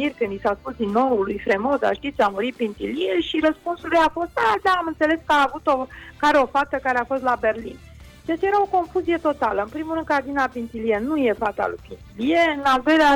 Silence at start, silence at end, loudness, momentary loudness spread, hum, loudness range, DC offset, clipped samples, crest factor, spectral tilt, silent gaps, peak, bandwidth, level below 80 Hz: 0 s; 0 s; -22 LUFS; 8 LU; none; 3 LU; under 0.1%; under 0.1%; 14 dB; -5 dB/octave; none; -8 dBFS; 16.5 kHz; -48 dBFS